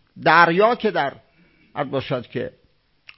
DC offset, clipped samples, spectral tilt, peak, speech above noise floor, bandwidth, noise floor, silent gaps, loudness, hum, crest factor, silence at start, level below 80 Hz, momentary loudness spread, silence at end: under 0.1%; under 0.1%; -9.5 dB/octave; 0 dBFS; 38 dB; 5.8 kHz; -57 dBFS; none; -19 LUFS; none; 22 dB; 0.15 s; -60 dBFS; 16 LU; 0.7 s